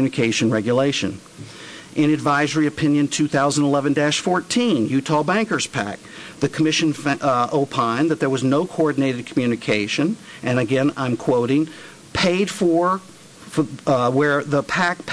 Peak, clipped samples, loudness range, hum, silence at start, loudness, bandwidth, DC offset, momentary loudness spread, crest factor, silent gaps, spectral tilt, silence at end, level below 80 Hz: -8 dBFS; under 0.1%; 2 LU; none; 0 s; -20 LUFS; 11 kHz; under 0.1%; 9 LU; 12 dB; none; -5 dB/octave; 0 s; -56 dBFS